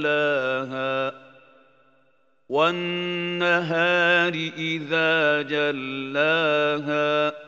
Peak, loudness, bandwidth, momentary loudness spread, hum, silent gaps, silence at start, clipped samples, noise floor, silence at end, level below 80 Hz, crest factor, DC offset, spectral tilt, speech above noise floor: -6 dBFS; -22 LUFS; 7.8 kHz; 8 LU; none; none; 0 s; under 0.1%; -66 dBFS; 0 s; -80 dBFS; 18 dB; under 0.1%; -5.5 dB/octave; 43 dB